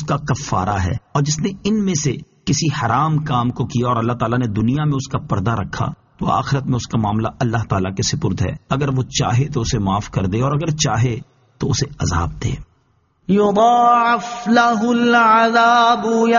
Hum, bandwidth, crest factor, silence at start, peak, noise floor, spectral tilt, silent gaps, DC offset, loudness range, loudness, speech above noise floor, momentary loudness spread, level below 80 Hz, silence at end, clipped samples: none; 7.4 kHz; 16 dB; 0 s; -2 dBFS; -60 dBFS; -5.5 dB/octave; none; under 0.1%; 6 LU; -18 LUFS; 43 dB; 9 LU; -40 dBFS; 0 s; under 0.1%